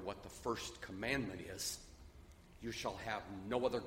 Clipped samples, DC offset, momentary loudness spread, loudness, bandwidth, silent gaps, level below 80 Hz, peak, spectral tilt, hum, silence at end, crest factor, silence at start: under 0.1%; under 0.1%; 21 LU; -43 LUFS; 16 kHz; none; -60 dBFS; -22 dBFS; -3.5 dB/octave; none; 0 s; 22 dB; 0 s